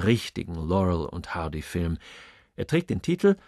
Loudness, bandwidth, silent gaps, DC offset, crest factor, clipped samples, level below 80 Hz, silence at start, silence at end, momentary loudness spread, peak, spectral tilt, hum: -28 LUFS; 13 kHz; none; under 0.1%; 18 dB; under 0.1%; -44 dBFS; 0 s; 0.1 s; 13 LU; -8 dBFS; -7 dB/octave; none